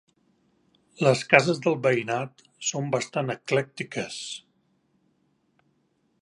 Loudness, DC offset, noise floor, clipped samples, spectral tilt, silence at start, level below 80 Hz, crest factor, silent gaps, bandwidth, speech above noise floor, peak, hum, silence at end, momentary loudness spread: -25 LUFS; under 0.1%; -70 dBFS; under 0.1%; -4.5 dB/octave; 1 s; -74 dBFS; 26 dB; none; 11.5 kHz; 45 dB; 0 dBFS; none; 1.8 s; 15 LU